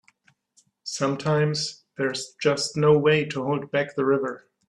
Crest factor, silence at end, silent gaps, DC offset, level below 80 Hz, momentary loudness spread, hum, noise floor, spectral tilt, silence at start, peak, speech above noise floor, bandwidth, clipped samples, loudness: 18 dB; 0.3 s; none; under 0.1%; -64 dBFS; 11 LU; none; -65 dBFS; -5 dB/octave; 0.85 s; -8 dBFS; 41 dB; 11.5 kHz; under 0.1%; -24 LUFS